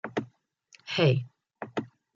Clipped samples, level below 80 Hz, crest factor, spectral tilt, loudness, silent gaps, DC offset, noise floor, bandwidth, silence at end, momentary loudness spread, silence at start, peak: under 0.1%; -70 dBFS; 20 dB; -6.5 dB/octave; -29 LUFS; none; under 0.1%; -62 dBFS; 7.4 kHz; 0.3 s; 23 LU; 0.05 s; -12 dBFS